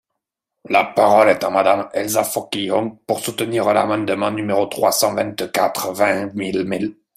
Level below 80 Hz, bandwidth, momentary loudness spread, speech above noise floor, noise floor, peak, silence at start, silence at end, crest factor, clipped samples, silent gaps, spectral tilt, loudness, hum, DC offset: -62 dBFS; 16 kHz; 8 LU; 62 dB; -80 dBFS; -2 dBFS; 0.7 s; 0.25 s; 18 dB; under 0.1%; none; -4 dB/octave; -18 LUFS; none; under 0.1%